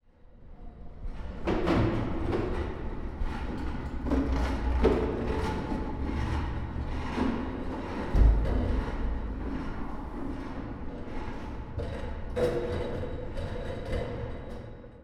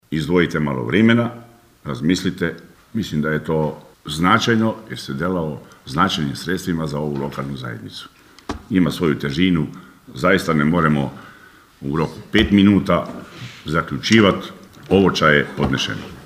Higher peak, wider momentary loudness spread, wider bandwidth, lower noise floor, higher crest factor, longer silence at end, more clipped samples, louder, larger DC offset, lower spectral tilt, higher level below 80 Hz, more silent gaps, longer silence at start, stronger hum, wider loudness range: second, -10 dBFS vs 0 dBFS; second, 13 LU vs 18 LU; second, 9.2 kHz vs 15.5 kHz; first, -51 dBFS vs -46 dBFS; about the same, 20 dB vs 20 dB; about the same, 0 s vs 0 s; neither; second, -32 LUFS vs -19 LUFS; neither; first, -8 dB/octave vs -6 dB/octave; first, -34 dBFS vs -42 dBFS; neither; first, 0.25 s vs 0.1 s; neither; about the same, 5 LU vs 6 LU